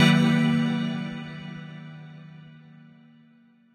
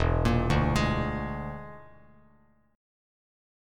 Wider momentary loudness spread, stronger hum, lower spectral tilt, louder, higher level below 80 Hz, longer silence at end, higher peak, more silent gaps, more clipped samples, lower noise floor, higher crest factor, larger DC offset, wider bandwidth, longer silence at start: first, 25 LU vs 15 LU; neither; about the same, -6 dB/octave vs -6.5 dB/octave; first, -24 LUFS vs -28 LUFS; second, -66 dBFS vs -36 dBFS; second, 1.3 s vs 1.9 s; first, -6 dBFS vs -10 dBFS; neither; neither; second, -58 dBFS vs -64 dBFS; about the same, 20 dB vs 20 dB; neither; second, 13 kHz vs 14.5 kHz; about the same, 0 s vs 0 s